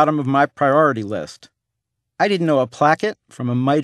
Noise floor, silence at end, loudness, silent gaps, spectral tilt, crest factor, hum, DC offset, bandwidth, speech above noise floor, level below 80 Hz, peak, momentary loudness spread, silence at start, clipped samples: -79 dBFS; 0 s; -18 LUFS; none; -7 dB/octave; 18 dB; none; under 0.1%; 11.5 kHz; 61 dB; -66 dBFS; 0 dBFS; 12 LU; 0 s; under 0.1%